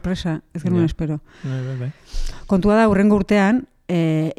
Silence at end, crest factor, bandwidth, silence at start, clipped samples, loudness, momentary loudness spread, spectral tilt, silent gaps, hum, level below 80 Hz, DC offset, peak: 0.05 s; 12 dB; 11.5 kHz; 0.05 s; under 0.1%; -19 LUFS; 14 LU; -7.5 dB/octave; none; none; -34 dBFS; under 0.1%; -6 dBFS